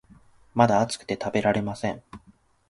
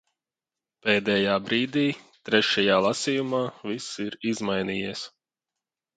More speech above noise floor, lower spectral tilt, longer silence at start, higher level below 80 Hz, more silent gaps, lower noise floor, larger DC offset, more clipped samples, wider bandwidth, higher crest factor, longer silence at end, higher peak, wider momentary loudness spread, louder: second, 35 dB vs over 65 dB; first, -5.5 dB/octave vs -4 dB/octave; second, 0.55 s vs 0.85 s; first, -56 dBFS vs -64 dBFS; neither; second, -59 dBFS vs under -90 dBFS; neither; neither; first, 11.5 kHz vs 9.4 kHz; about the same, 24 dB vs 22 dB; second, 0.5 s vs 0.9 s; about the same, -4 dBFS vs -6 dBFS; about the same, 11 LU vs 12 LU; about the same, -25 LUFS vs -25 LUFS